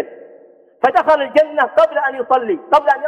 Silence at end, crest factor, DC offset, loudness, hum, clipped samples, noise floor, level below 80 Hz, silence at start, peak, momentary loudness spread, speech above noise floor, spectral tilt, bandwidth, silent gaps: 0 s; 14 dB; under 0.1%; -15 LUFS; none; under 0.1%; -45 dBFS; -60 dBFS; 0 s; -2 dBFS; 5 LU; 31 dB; -4.5 dB/octave; 8.8 kHz; none